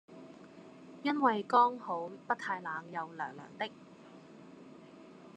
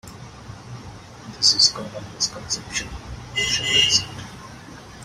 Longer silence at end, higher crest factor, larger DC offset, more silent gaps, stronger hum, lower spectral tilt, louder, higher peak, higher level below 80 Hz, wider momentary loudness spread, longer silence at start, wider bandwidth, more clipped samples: about the same, 0.05 s vs 0 s; about the same, 22 dB vs 22 dB; neither; neither; neither; first, -5.5 dB/octave vs -0.5 dB/octave; second, -34 LUFS vs -19 LUFS; second, -14 dBFS vs -2 dBFS; second, -90 dBFS vs -46 dBFS; about the same, 26 LU vs 25 LU; about the same, 0.1 s vs 0.05 s; second, 9.2 kHz vs 16 kHz; neither